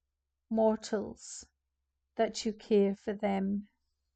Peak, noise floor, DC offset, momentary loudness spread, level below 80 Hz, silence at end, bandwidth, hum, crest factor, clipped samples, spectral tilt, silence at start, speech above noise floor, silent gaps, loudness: -16 dBFS; -85 dBFS; under 0.1%; 16 LU; -66 dBFS; 0.5 s; 9 kHz; none; 16 dB; under 0.1%; -5.5 dB/octave; 0.5 s; 54 dB; none; -32 LUFS